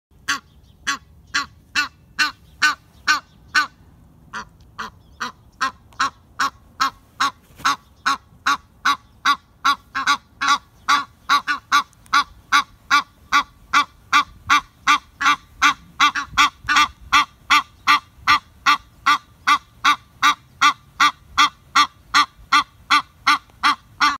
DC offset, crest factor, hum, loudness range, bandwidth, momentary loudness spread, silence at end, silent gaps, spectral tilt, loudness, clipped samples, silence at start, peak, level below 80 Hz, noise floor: under 0.1%; 20 dB; none; 7 LU; 16 kHz; 9 LU; 0 s; none; 0 dB/octave; -19 LUFS; under 0.1%; 0.3 s; 0 dBFS; -52 dBFS; -49 dBFS